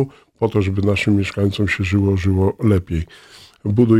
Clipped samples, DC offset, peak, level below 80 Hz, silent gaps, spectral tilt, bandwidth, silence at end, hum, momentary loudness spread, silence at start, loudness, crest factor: under 0.1%; under 0.1%; -2 dBFS; -38 dBFS; none; -7.5 dB/octave; 11 kHz; 0 s; none; 9 LU; 0 s; -19 LUFS; 16 dB